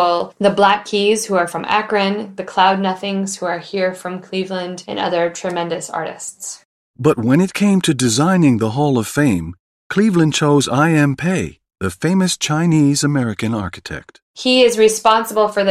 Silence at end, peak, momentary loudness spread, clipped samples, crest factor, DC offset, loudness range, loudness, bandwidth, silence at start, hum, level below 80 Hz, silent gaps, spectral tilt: 0 s; 0 dBFS; 12 LU; under 0.1%; 16 dB; under 0.1%; 6 LU; -16 LUFS; 15.5 kHz; 0 s; none; -54 dBFS; 6.65-6.94 s, 9.60-9.90 s, 14.22-14.34 s; -5 dB/octave